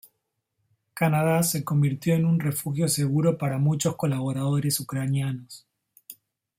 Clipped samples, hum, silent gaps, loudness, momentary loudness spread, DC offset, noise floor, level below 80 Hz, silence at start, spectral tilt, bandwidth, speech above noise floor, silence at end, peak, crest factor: under 0.1%; none; none; -25 LUFS; 5 LU; under 0.1%; -78 dBFS; -62 dBFS; 0.95 s; -5.5 dB/octave; 16.5 kHz; 54 dB; 0.45 s; -10 dBFS; 16 dB